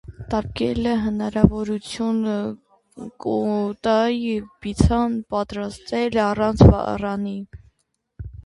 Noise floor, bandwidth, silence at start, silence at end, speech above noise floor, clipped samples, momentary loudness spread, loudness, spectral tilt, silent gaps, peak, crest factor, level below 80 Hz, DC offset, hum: -72 dBFS; 11.5 kHz; 0.05 s; 0.05 s; 51 dB; under 0.1%; 14 LU; -21 LUFS; -7.5 dB/octave; none; 0 dBFS; 22 dB; -32 dBFS; under 0.1%; none